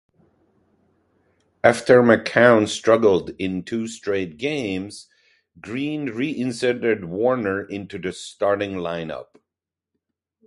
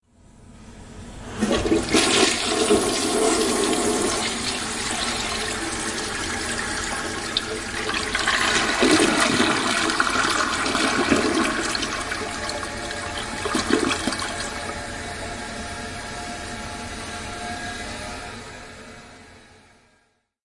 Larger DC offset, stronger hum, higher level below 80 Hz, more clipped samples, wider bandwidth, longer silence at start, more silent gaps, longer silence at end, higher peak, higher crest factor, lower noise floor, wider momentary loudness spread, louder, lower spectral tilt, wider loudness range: neither; neither; second, -56 dBFS vs -44 dBFS; neither; about the same, 11.5 kHz vs 11.5 kHz; first, 1.65 s vs 0.35 s; neither; first, 1.25 s vs 1 s; first, 0 dBFS vs -4 dBFS; about the same, 22 dB vs 20 dB; first, -87 dBFS vs -66 dBFS; about the same, 15 LU vs 13 LU; about the same, -21 LUFS vs -22 LUFS; first, -5.5 dB/octave vs -2.5 dB/octave; second, 8 LU vs 12 LU